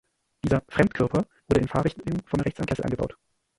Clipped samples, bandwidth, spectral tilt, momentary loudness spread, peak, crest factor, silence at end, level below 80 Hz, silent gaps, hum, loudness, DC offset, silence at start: under 0.1%; 11.5 kHz; -7.5 dB/octave; 8 LU; -4 dBFS; 22 dB; 0.45 s; -44 dBFS; none; none; -26 LUFS; under 0.1%; 0.45 s